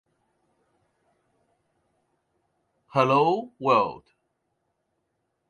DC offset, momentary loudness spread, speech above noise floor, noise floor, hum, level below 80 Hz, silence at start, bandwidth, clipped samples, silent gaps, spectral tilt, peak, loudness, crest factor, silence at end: under 0.1%; 8 LU; 54 dB; -77 dBFS; none; -72 dBFS; 2.95 s; 10.5 kHz; under 0.1%; none; -7 dB/octave; -6 dBFS; -23 LUFS; 22 dB; 1.5 s